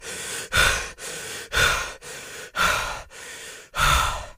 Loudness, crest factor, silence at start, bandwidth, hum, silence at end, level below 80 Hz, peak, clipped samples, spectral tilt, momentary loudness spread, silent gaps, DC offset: -23 LUFS; 20 dB; 0 s; 15.5 kHz; none; 0.05 s; -36 dBFS; -6 dBFS; under 0.1%; -1.5 dB/octave; 17 LU; none; under 0.1%